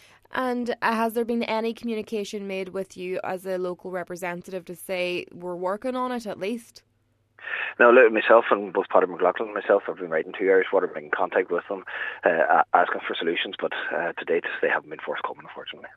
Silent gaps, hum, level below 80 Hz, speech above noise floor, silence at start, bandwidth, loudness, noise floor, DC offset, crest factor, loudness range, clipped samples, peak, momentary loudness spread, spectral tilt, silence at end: none; none; -70 dBFS; 43 dB; 0.3 s; 14 kHz; -24 LUFS; -68 dBFS; under 0.1%; 22 dB; 10 LU; under 0.1%; -2 dBFS; 14 LU; -5 dB/octave; 0.1 s